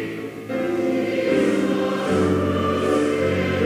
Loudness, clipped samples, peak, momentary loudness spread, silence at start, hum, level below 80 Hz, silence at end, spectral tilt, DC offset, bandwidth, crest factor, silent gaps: -21 LUFS; under 0.1%; -8 dBFS; 6 LU; 0 s; none; -42 dBFS; 0 s; -6.5 dB/octave; under 0.1%; 16 kHz; 14 dB; none